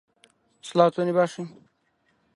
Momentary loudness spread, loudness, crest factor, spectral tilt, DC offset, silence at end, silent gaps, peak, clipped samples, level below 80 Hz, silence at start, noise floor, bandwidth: 19 LU; -23 LUFS; 22 dB; -6.5 dB/octave; under 0.1%; 0.9 s; none; -4 dBFS; under 0.1%; -74 dBFS; 0.65 s; -69 dBFS; 11.5 kHz